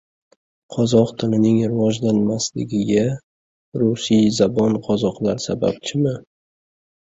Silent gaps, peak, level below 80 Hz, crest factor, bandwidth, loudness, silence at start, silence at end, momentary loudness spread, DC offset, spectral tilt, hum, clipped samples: 3.23-3.72 s; -2 dBFS; -54 dBFS; 18 dB; 8 kHz; -19 LUFS; 0.7 s; 1 s; 7 LU; under 0.1%; -6 dB/octave; none; under 0.1%